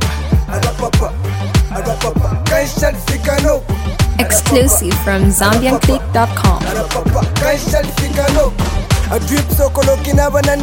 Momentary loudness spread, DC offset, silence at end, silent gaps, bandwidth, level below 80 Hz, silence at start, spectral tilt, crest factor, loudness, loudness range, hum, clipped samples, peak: 6 LU; under 0.1%; 0 s; none; 17 kHz; -20 dBFS; 0 s; -5 dB/octave; 14 dB; -14 LUFS; 3 LU; none; under 0.1%; 0 dBFS